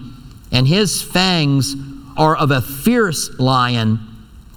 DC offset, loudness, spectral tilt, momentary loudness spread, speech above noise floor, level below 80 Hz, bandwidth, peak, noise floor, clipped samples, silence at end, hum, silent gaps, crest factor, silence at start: under 0.1%; -16 LUFS; -5 dB/octave; 7 LU; 20 dB; -40 dBFS; 19 kHz; 0 dBFS; -36 dBFS; under 0.1%; 0.15 s; none; none; 16 dB; 0 s